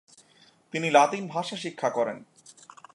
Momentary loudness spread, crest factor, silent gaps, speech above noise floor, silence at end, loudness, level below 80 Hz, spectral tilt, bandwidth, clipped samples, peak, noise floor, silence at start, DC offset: 13 LU; 24 dB; none; 34 dB; 0.45 s; -26 LUFS; -82 dBFS; -4 dB/octave; 11.5 kHz; under 0.1%; -4 dBFS; -60 dBFS; 0.75 s; under 0.1%